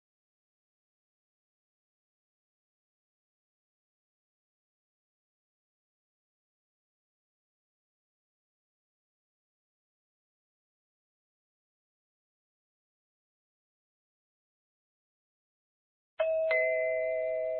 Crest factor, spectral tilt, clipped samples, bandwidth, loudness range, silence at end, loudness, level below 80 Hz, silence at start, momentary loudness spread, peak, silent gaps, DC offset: 26 dB; 1.5 dB/octave; under 0.1%; 4 kHz; 7 LU; 0 s; -30 LUFS; -80 dBFS; 16.2 s; 5 LU; -16 dBFS; none; under 0.1%